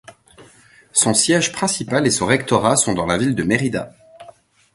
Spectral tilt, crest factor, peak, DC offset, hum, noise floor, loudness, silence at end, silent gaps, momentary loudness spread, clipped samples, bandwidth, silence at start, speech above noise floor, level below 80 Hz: -3.5 dB/octave; 20 dB; 0 dBFS; under 0.1%; none; -49 dBFS; -17 LUFS; 0.5 s; none; 6 LU; under 0.1%; 12 kHz; 0.1 s; 32 dB; -48 dBFS